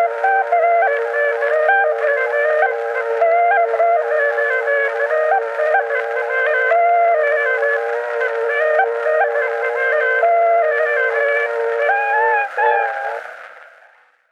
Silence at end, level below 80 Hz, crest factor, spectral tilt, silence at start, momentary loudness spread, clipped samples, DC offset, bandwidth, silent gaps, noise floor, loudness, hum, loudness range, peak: 0.7 s; -82 dBFS; 14 dB; -0.5 dB/octave; 0 s; 5 LU; under 0.1%; under 0.1%; 8.6 kHz; none; -51 dBFS; -16 LUFS; none; 1 LU; -2 dBFS